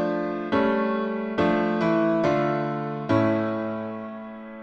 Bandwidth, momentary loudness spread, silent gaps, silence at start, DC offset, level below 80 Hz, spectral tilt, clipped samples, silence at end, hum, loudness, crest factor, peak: 7.6 kHz; 11 LU; none; 0 s; under 0.1%; -58 dBFS; -8 dB/octave; under 0.1%; 0 s; none; -24 LUFS; 14 dB; -10 dBFS